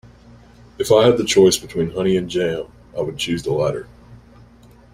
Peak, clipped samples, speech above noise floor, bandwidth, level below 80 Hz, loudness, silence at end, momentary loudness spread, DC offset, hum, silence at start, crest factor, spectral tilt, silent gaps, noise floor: -2 dBFS; under 0.1%; 29 dB; 16 kHz; -48 dBFS; -18 LUFS; 0.8 s; 13 LU; under 0.1%; none; 0.8 s; 18 dB; -4.5 dB/octave; none; -47 dBFS